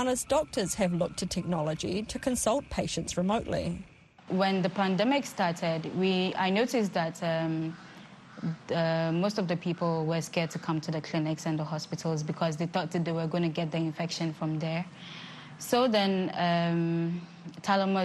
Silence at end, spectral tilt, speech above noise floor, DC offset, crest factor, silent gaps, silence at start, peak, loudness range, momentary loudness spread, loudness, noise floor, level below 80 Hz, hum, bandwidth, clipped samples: 0 s; -5.5 dB/octave; 20 dB; under 0.1%; 18 dB; none; 0 s; -12 dBFS; 3 LU; 10 LU; -30 LUFS; -50 dBFS; -56 dBFS; none; 12.5 kHz; under 0.1%